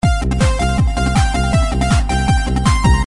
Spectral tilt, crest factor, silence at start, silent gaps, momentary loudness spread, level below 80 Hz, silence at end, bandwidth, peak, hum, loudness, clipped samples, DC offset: -5.5 dB/octave; 12 dB; 0.05 s; none; 2 LU; -18 dBFS; 0 s; 11.5 kHz; -2 dBFS; none; -16 LUFS; under 0.1%; 0.5%